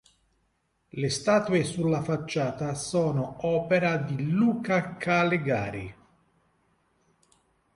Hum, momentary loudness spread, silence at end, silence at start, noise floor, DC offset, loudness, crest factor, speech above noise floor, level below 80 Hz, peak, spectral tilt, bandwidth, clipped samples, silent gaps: none; 8 LU; 1.8 s; 0.95 s; -73 dBFS; under 0.1%; -27 LUFS; 18 dB; 47 dB; -60 dBFS; -10 dBFS; -6 dB/octave; 11.5 kHz; under 0.1%; none